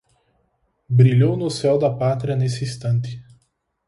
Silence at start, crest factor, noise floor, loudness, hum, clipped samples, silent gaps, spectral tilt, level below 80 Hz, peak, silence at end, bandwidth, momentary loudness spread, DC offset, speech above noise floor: 0.9 s; 16 dB; -67 dBFS; -19 LUFS; none; under 0.1%; none; -7.5 dB/octave; -54 dBFS; -4 dBFS; 0.65 s; 11.5 kHz; 10 LU; under 0.1%; 49 dB